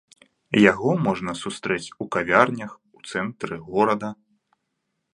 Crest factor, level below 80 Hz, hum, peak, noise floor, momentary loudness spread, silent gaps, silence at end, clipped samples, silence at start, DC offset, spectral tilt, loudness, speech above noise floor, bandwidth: 24 dB; -58 dBFS; none; 0 dBFS; -77 dBFS; 15 LU; none; 1 s; under 0.1%; 0.5 s; under 0.1%; -5.5 dB/octave; -22 LUFS; 55 dB; 11 kHz